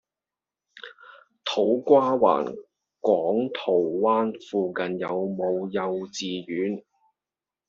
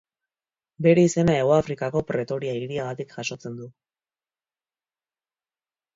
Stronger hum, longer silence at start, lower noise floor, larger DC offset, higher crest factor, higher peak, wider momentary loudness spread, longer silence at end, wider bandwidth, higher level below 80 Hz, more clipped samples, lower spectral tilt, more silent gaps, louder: neither; about the same, 0.75 s vs 0.8 s; about the same, under -90 dBFS vs under -90 dBFS; neither; about the same, 20 dB vs 20 dB; about the same, -4 dBFS vs -6 dBFS; about the same, 15 LU vs 14 LU; second, 0.9 s vs 2.25 s; about the same, 7.6 kHz vs 7.8 kHz; second, -72 dBFS vs -56 dBFS; neither; second, -4 dB/octave vs -6.5 dB/octave; neither; about the same, -25 LUFS vs -23 LUFS